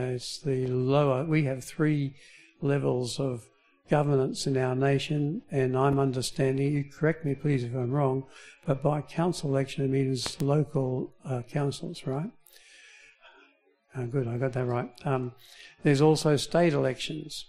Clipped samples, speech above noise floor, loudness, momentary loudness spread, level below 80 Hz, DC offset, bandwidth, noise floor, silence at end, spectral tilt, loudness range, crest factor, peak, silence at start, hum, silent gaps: under 0.1%; 37 dB; -28 LUFS; 10 LU; -58 dBFS; under 0.1%; 13.5 kHz; -64 dBFS; 0.05 s; -6.5 dB/octave; 7 LU; 20 dB; -10 dBFS; 0 s; none; none